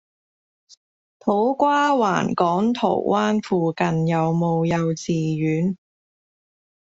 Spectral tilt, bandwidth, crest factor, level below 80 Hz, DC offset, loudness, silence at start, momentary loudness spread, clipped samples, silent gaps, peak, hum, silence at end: -6.5 dB/octave; 7.8 kHz; 18 dB; -60 dBFS; under 0.1%; -21 LUFS; 1.25 s; 5 LU; under 0.1%; none; -4 dBFS; none; 1.25 s